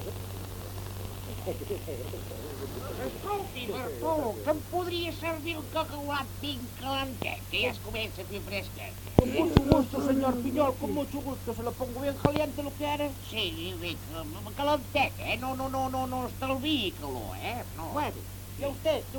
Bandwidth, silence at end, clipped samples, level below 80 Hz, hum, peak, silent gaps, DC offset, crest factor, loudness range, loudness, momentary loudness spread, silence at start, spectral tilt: 19 kHz; 0 s; under 0.1%; -46 dBFS; none; 0 dBFS; none; under 0.1%; 32 dB; 6 LU; -32 LUFS; 11 LU; 0 s; -5.5 dB/octave